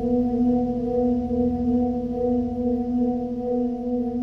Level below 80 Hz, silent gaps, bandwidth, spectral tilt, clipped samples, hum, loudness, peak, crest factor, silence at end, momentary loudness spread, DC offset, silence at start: -42 dBFS; none; 3.1 kHz; -10.5 dB/octave; under 0.1%; none; -24 LUFS; -12 dBFS; 10 dB; 0 s; 4 LU; 0.1%; 0 s